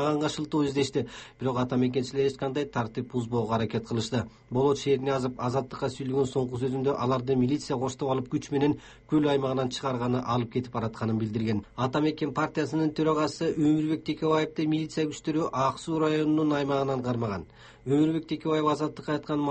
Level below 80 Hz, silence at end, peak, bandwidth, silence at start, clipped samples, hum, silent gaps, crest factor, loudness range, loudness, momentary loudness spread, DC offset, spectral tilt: -58 dBFS; 0 s; -12 dBFS; 8.4 kHz; 0 s; under 0.1%; none; none; 14 dB; 2 LU; -28 LUFS; 6 LU; under 0.1%; -6.5 dB/octave